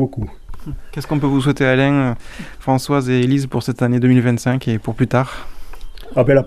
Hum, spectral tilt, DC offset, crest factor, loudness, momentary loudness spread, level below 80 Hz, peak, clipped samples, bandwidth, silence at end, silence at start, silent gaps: none; -7 dB/octave; under 0.1%; 16 dB; -17 LUFS; 16 LU; -36 dBFS; -2 dBFS; under 0.1%; 14.5 kHz; 0 s; 0 s; none